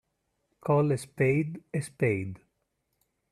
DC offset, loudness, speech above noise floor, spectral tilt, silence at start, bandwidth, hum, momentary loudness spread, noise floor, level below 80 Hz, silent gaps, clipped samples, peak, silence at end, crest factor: under 0.1%; -29 LUFS; 51 dB; -7.5 dB/octave; 0.65 s; 13 kHz; none; 10 LU; -78 dBFS; -66 dBFS; none; under 0.1%; -12 dBFS; 0.95 s; 18 dB